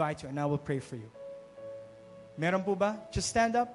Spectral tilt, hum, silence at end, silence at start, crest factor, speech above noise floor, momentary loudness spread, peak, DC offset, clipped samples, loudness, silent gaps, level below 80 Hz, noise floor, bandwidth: -5 dB/octave; none; 0 s; 0 s; 18 dB; 20 dB; 19 LU; -16 dBFS; under 0.1%; under 0.1%; -31 LUFS; none; -54 dBFS; -51 dBFS; 11.5 kHz